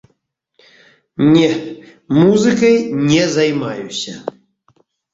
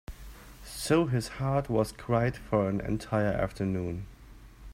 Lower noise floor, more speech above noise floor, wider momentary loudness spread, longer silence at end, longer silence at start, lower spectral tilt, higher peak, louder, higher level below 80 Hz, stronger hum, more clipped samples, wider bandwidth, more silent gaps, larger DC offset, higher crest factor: first, -66 dBFS vs -50 dBFS; first, 52 dB vs 22 dB; about the same, 18 LU vs 20 LU; first, 0.85 s vs 0 s; first, 1.2 s vs 0.1 s; about the same, -5.5 dB/octave vs -6.5 dB/octave; first, -2 dBFS vs -12 dBFS; first, -14 LUFS vs -30 LUFS; about the same, -52 dBFS vs -48 dBFS; neither; neither; second, 8 kHz vs 16 kHz; neither; neither; about the same, 14 dB vs 18 dB